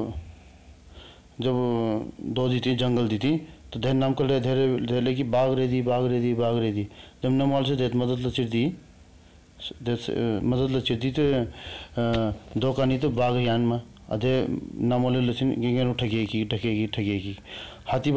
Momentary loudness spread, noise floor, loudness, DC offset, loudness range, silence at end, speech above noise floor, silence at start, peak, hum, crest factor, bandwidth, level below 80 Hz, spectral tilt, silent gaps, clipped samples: 9 LU; -52 dBFS; -26 LUFS; 0.3%; 3 LU; 0 s; 27 dB; 0 s; -14 dBFS; none; 10 dB; 8 kHz; -48 dBFS; -7.5 dB/octave; none; under 0.1%